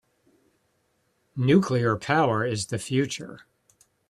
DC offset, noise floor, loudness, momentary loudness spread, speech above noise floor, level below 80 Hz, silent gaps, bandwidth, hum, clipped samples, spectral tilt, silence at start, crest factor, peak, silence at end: under 0.1%; -71 dBFS; -24 LUFS; 14 LU; 47 dB; -64 dBFS; none; 13 kHz; none; under 0.1%; -6 dB/octave; 1.35 s; 20 dB; -6 dBFS; 0.75 s